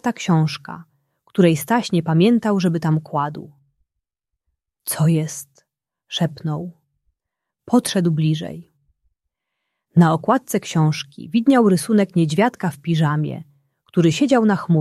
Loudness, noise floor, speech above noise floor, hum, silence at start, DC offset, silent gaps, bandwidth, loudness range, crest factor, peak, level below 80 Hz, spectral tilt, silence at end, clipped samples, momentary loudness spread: -19 LUFS; -82 dBFS; 64 dB; none; 0.05 s; under 0.1%; none; 14 kHz; 7 LU; 18 dB; -2 dBFS; -62 dBFS; -6.5 dB/octave; 0 s; under 0.1%; 13 LU